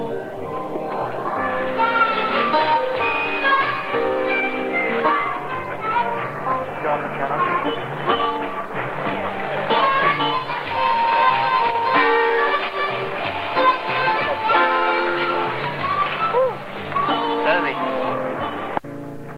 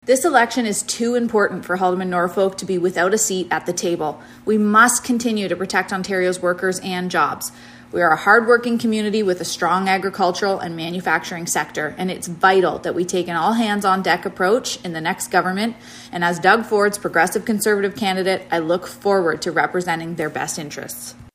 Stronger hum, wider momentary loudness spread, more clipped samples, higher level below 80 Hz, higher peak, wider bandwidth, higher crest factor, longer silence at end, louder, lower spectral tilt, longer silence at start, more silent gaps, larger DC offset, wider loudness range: neither; about the same, 9 LU vs 9 LU; neither; about the same, -54 dBFS vs -58 dBFS; second, -4 dBFS vs 0 dBFS; about the same, 15.5 kHz vs 15.5 kHz; about the same, 16 dB vs 20 dB; about the same, 0 s vs 0.1 s; about the same, -20 LUFS vs -19 LUFS; first, -6 dB/octave vs -3.5 dB/octave; about the same, 0 s vs 0.05 s; neither; neither; about the same, 4 LU vs 2 LU